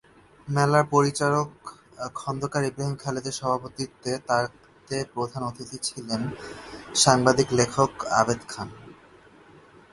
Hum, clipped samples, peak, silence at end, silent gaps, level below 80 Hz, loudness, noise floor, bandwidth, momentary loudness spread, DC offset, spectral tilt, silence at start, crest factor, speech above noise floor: none; under 0.1%; -2 dBFS; 1 s; none; -56 dBFS; -25 LUFS; -52 dBFS; 11.5 kHz; 16 LU; under 0.1%; -4 dB/octave; 0.45 s; 24 dB; 27 dB